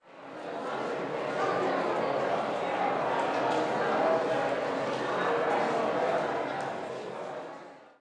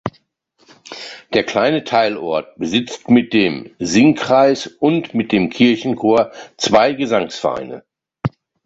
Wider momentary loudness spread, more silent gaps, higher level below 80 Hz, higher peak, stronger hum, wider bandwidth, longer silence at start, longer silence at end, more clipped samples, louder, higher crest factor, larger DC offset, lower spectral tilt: about the same, 11 LU vs 13 LU; neither; second, -74 dBFS vs -52 dBFS; second, -16 dBFS vs -2 dBFS; neither; first, 10.5 kHz vs 8 kHz; about the same, 0.05 s vs 0.05 s; second, 0.15 s vs 0.35 s; neither; second, -30 LUFS vs -16 LUFS; about the same, 14 dB vs 16 dB; neither; about the same, -5 dB/octave vs -5 dB/octave